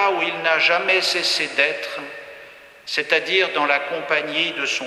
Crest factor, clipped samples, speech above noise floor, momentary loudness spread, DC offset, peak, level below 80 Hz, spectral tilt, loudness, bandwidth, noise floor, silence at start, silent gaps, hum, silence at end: 20 dB; under 0.1%; 23 dB; 15 LU; under 0.1%; 0 dBFS; -70 dBFS; -1.5 dB/octave; -19 LUFS; 13 kHz; -43 dBFS; 0 s; none; none; 0 s